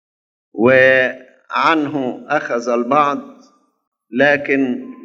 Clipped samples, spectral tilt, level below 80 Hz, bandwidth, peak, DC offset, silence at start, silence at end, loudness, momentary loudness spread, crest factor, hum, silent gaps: under 0.1%; -5.5 dB/octave; -68 dBFS; 7.6 kHz; 0 dBFS; under 0.1%; 0.55 s; 0 s; -15 LUFS; 13 LU; 18 dB; none; 3.87-3.92 s